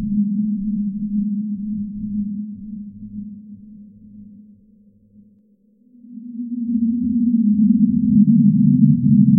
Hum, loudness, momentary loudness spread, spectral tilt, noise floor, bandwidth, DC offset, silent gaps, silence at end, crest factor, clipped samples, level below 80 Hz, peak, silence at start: none; -18 LUFS; 20 LU; -18 dB/octave; -56 dBFS; 0.5 kHz; under 0.1%; none; 0 s; 16 dB; under 0.1%; -48 dBFS; -2 dBFS; 0 s